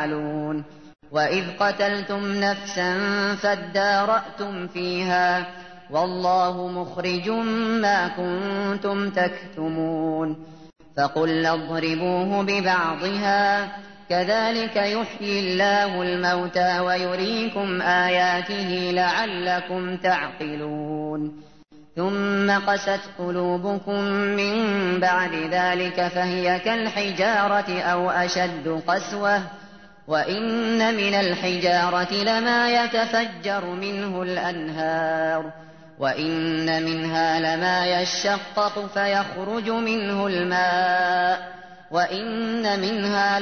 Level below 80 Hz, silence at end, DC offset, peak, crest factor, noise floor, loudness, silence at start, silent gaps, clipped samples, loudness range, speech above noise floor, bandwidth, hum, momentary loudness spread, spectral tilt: -64 dBFS; 0 s; 0.2%; -8 dBFS; 16 dB; -50 dBFS; -23 LUFS; 0 s; none; under 0.1%; 3 LU; 27 dB; 6.6 kHz; none; 8 LU; -4.5 dB/octave